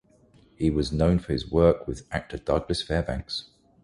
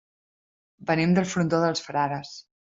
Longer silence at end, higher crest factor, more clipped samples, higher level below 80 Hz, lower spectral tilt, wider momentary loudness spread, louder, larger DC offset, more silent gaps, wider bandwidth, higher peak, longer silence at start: first, 0.4 s vs 0.2 s; about the same, 20 dB vs 18 dB; neither; first, -38 dBFS vs -62 dBFS; about the same, -6.5 dB/octave vs -6 dB/octave; about the same, 12 LU vs 13 LU; about the same, -26 LUFS vs -25 LUFS; neither; neither; first, 11.5 kHz vs 7.8 kHz; about the same, -6 dBFS vs -8 dBFS; second, 0.6 s vs 0.8 s